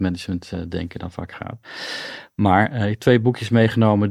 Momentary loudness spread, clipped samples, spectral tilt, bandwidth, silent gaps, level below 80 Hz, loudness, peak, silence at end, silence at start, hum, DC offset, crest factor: 15 LU; under 0.1%; -7 dB/octave; 13 kHz; none; -48 dBFS; -20 LUFS; -2 dBFS; 0 s; 0 s; none; under 0.1%; 18 dB